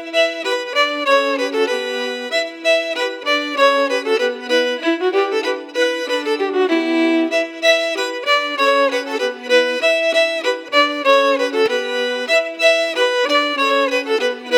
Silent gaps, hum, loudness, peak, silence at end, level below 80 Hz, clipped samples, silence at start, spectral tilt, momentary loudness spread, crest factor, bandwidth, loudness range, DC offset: none; none; -17 LUFS; 0 dBFS; 0 s; -86 dBFS; under 0.1%; 0 s; -0.5 dB/octave; 6 LU; 16 dB; 18 kHz; 2 LU; under 0.1%